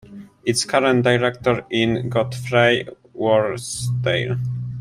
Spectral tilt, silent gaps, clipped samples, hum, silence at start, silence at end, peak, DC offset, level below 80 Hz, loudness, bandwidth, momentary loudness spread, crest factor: -5 dB/octave; none; under 0.1%; none; 0.05 s; 0 s; -2 dBFS; under 0.1%; -52 dBFS; -20 LUFS; 14.5 kHz; 8 LU; 18 dB